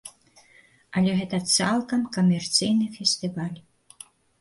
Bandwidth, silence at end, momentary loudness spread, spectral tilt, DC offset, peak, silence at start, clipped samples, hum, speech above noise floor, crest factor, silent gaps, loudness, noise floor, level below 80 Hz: 11.5 kHz; 0.8 s; 12 LU; -4 dB/octave; under 0.1%; -6 dBFS; 0.05 s; under 0.1%; none; 33 dB; 20 dB; none; -24 LUFS; -57 dBFS; -62 dBFS